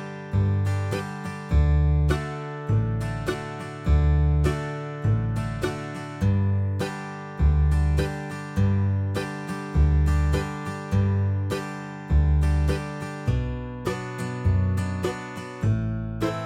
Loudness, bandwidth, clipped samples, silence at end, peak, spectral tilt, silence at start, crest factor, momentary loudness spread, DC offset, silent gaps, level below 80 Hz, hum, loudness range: -26 LUFS; 11.5 kHz; under 0.1%; 0 s; -10 dBFS; -7.5 dB/octave; 0 s; 14 dB; 11 LU; under 0.1%; none; -28 dBFS; none; 2 LU